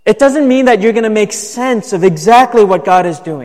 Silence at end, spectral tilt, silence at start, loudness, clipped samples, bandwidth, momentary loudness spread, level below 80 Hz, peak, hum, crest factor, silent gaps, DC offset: 0 s; -5 dB/octave; 0.05 s; -10 LUFS; 0.2%; 15 kHz; 8 LU; -48 dBFS; 0 dBFS; none; 10 dB; none; 0.6%